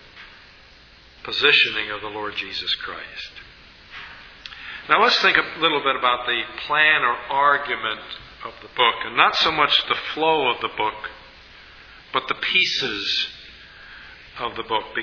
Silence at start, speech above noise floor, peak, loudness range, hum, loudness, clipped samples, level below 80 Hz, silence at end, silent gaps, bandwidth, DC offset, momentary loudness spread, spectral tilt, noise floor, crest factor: 0.15 s; 27 dB; 0 dBFS; 5 LU; none; -20 LUFS; under 0.1%; -54 dBFS; 0 s; none; 5.4 kHz; under 0.1%; 22 LU; -2.5 dB/octave; -49 dBFS; 24 dB